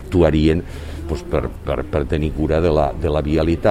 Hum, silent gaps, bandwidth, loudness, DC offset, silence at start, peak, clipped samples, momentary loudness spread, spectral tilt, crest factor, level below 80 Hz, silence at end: none; none; 12.5 kHz; -19 LUFS; under 0.1%; 0 s; -2 dBFS; under 0.1%; 11 LU; -8 dB/octave; 16 dB; -28 dBFS; 0 s